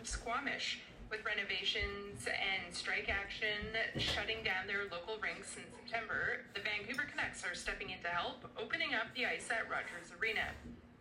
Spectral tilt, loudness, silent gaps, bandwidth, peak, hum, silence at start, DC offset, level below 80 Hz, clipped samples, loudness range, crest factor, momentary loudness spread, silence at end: -2.5 dB/octave; -38 LUFS; none; 16 kHz; -22 dBFS; none; 0 s; under 0.1%; -58 dBFS; under 0.1%; 3 LU; 18 dB; 7 LU; 0 s